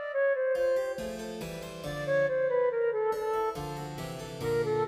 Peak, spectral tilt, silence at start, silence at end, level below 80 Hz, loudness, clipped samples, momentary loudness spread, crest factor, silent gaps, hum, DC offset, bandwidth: -18 dBFS; -5.5 dB/octave; 0 s; 0 s; -56 dBFS; -31 LUFS; under 0.1%; 11 LU; 12 dB; none; none; under 0.1%; 15.5 kHz